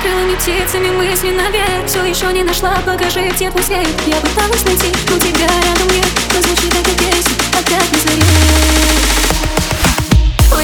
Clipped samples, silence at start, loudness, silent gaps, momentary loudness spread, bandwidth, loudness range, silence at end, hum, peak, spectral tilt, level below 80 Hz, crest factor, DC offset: under 0.1%; 0 s; -12 LUFS; none; 4 LU; over 20 kHz; 3 LU; 0 s; none; 0 dBFS; -3.5 dB/octave; -18 dBFS; 12 dB; under 0.1%